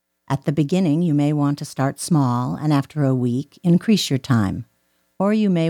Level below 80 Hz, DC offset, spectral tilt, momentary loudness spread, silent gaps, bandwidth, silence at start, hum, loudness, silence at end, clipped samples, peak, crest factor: -56 dBFS; under 0.1%; -6.5 dB/octave; 6 LU; none; 17.5 kHz; 0.3 s; none; -20 LUFS; 0 s; under 0.1%; -6 dBFS; 14 dB